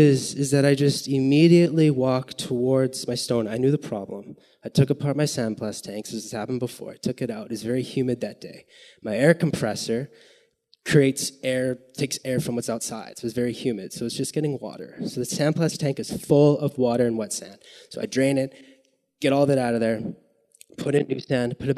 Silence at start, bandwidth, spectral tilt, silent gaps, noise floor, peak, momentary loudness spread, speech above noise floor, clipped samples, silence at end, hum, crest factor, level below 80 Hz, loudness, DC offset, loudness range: 0 s; 13.5 kHz; -6 dB/octave; none; -61 dBFS; -2 dBFS; 13 LU; 38 dB; under 0.1%; 0 s; none; 22 dB; -62 dBFS; -24 LUFS; under 0.1%; 7 LU